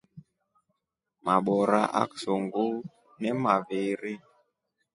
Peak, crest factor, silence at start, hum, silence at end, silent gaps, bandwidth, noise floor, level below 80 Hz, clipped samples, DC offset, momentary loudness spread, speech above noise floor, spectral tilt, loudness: -8 dBFS; 22 dB; 0.15 s; none; 0.75 s; none; 11.5 kHz; -83 dBFS; -72 dBFS; under 0.1%; under 0.1%; 13 LU; 56 dB; -6.5 dB/octave; -28 LUFS